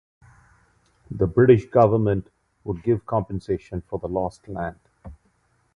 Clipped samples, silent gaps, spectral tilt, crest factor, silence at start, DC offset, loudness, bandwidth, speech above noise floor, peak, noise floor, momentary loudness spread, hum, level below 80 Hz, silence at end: under 0.1%; none; -9.5 dB/octave; 20 dB; 1.1 s; under 0.1%; -22 LUFS; 7.2 kHz; 44 dB; -2 dBFS; -65 dBFS; 16 LU; none; -46 dBFS; 0.6 s